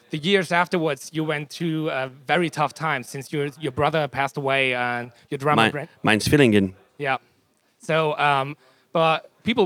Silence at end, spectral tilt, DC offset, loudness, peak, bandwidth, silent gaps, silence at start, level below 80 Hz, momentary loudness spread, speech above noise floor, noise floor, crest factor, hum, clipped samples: 0 s; -5 dB/octave; under 0.1%; -23 LUFS; -2 dBFS; 17 kHz; none; 0.1 s; -58 dBFS; 10 LU; 42 dB; -64 dBFS; 22 dB; none; under 0.1%